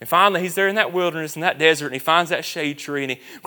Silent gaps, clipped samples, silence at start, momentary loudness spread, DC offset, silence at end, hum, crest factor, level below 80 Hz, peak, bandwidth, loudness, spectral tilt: none; under 0.1%; 0 s; 9 LU; under 0.1%; 0.1 s; none; 20 dB; -74 dBFS; 0 dBFS; 19.5 kHz; -20 LUFS; -3.5 dB/octave